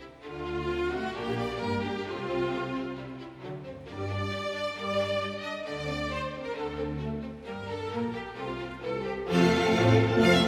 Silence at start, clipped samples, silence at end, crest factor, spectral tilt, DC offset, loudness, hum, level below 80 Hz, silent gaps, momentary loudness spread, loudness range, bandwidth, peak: 0 s; under 0.1%; 0 s; 20 dB; -6 dB/octave; under 0.1%; -30 LUFS; none; -50 dBFS; none; 16 LU; 6 LU; 15 kHz; -8 dBFS